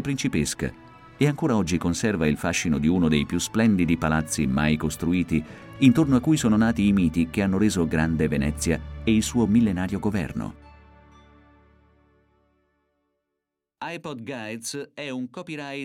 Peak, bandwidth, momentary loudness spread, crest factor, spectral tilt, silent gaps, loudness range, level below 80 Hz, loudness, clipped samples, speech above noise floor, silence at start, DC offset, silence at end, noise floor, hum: -6 dBFS; 16 kHz; 13 LU; 18 dB; -5.5 dB/octave; none; 15 LU; -42 dBFS; -24 LUFS; under 0.1%; 60 dB; 0 s; under 0.1%; 0 s; -83 dBFS; none